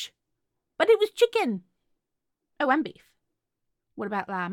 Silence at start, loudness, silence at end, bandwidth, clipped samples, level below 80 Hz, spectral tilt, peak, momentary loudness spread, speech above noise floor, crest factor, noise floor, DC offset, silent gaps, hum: 0 s; -25 LUFS; 0 s; 16 kHz; under 0.1%; -78 dBFS; -4.5 dB/octave; -8 dBFS; 15 LU; 56 dB; 20 dB; -82 dBFS; under 0.1%; none; none